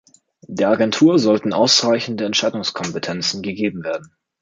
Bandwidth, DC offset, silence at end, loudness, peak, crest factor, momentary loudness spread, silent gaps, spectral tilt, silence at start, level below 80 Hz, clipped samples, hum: 9.4 kHz; under 0.1%; 0.35 s; -18 LUFS; -2 dBFS; 16 dB; 12 LU; none; -4 dB/octave; 0.5 s; -60 dBFS; under 0.1%; none